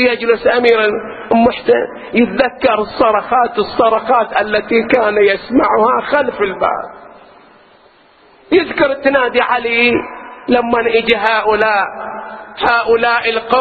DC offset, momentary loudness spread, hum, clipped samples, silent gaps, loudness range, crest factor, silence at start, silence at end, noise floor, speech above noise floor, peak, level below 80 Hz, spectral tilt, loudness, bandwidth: under 0.1%; 6 LU; none; under 0.1%; none; 4 LU; 14 dB; 0 s; 0 s; -47 dBFS; 34 dB; 0 dBFS; -46 dBFS; -7 dB/octave; -13 LUFS; 4.8 kHz